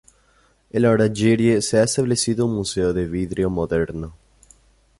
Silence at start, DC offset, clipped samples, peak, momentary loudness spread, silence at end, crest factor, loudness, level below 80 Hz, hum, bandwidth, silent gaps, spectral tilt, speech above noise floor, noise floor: 0.75 s; under 0.1%; under 0.1%; -6 dBFS; 9 LU; 0.85 s; 16 dB; -20 LUFS; -42 dBFS; none; 11.5 kHz; none; -5.5 dB/octave; 40 dB; -59 dBFS